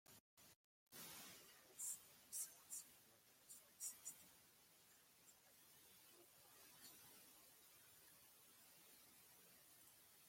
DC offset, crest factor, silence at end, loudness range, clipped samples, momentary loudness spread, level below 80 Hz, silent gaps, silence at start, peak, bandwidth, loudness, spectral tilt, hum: under 0.1%; 26 dB; 0 s; 11 LU; under 0.1%; 18 LU; under -90 dBFS; 0.20-0.37 s, 0.56-0.87 s; 0.05 s; -36 dBFS; 16.5 kHz; -58 LUFS; 0 dB/octave; none